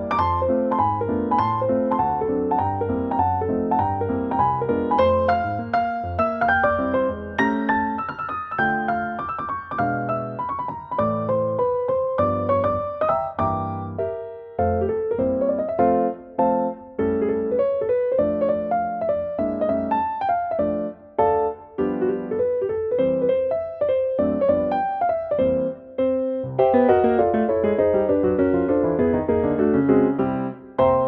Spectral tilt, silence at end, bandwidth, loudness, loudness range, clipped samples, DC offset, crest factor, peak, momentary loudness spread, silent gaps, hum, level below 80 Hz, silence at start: -9.5 dB/octave; 0 s; 6 kHz; -22 LUFS; 4 LU; under 0.1%; under 0.1%; 16 dB; -4 dBFS; 7 LU; none; none; -48 dBFS; 0 s